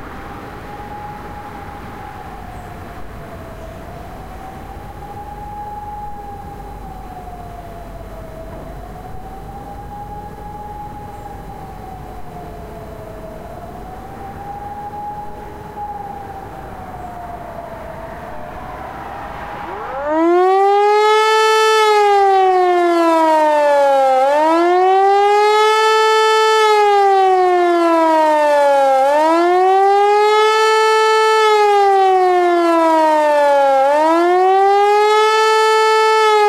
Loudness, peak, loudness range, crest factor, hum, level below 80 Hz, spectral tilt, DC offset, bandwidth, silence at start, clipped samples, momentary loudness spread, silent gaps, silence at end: -12 LUFS; -2 dBFS; 20 LU; 12 dB; none; -40 dBFS; -4 dB/octave; under 0.1%; 15.5 kHz; 0 s; under 0.1%; 21 LU; none; 0 s